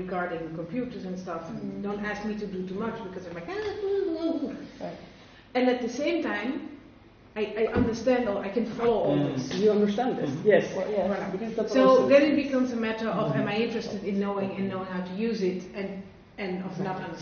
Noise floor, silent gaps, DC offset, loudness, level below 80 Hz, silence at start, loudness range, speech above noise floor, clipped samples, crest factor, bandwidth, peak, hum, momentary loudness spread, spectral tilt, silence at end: -52 dBFS; none; under 0.1%; -28 LUFS; -56 dBFS; 0 s; 9 LU; 25 dB; under 0.1%; 20 dB; 6.8 kHz; -6 dBFS; none; 13 LU; -5 dB/octave; 0 s